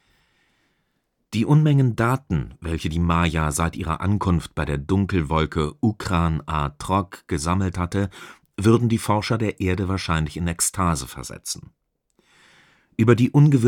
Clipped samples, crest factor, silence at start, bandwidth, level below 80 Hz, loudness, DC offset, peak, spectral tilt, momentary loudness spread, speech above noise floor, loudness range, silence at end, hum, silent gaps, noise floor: under 0.1%; 20 dB; 1.3 s; 16.5 kHz; -38 dBFS; -22 LUFS; under 0.1%; -2 dBFS; -6 dB/octave; 12 LU; 51 dB; 3 LU; 0 s; none; none; -72 dBFS